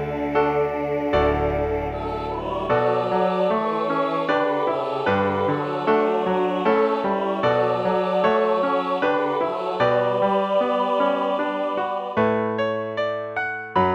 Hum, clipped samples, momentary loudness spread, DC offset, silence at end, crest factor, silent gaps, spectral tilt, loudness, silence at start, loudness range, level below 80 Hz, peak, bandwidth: none; under 0.1%; 5 LU; under 0.1%; 0 s; 16 dB; none; -7.5 dB/octave; -22 LUFS; 0 s; 2 LU; -44 dBFS; -6 dBFS; 8 kHz